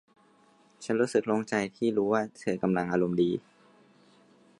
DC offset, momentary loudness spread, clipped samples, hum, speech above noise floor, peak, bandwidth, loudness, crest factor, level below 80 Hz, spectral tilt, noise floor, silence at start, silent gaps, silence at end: under 0.1%; 6 LU; under 0.1%; none; 34 dB; -12 dBFS; 11.5 kHz; -29 LUFS; 18 dB; -66 dBFS; -6.5 dB/octave; -62 dBFS; 0.8 s; none; 1.2 s